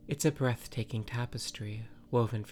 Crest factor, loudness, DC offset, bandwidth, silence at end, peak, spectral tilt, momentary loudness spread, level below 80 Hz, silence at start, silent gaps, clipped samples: 20 dB; -34 LUFS; under 0.1%; 17.5 kHz; 0 s; -14 dBFS; -5.5 dB/octave; 11 LU; -56 dBFS; 0 s; none; under 0.1%